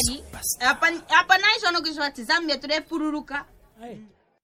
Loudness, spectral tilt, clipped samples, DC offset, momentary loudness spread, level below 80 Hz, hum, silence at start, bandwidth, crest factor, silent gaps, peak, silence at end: -22 LUFS; -1.5 dB/octave; under 0.1%; under 0.1%; 16 LU; -50 dBFS; none; 0 s; 16.5 kHz; 22 dB; none; -2 dBFS; 0.4 s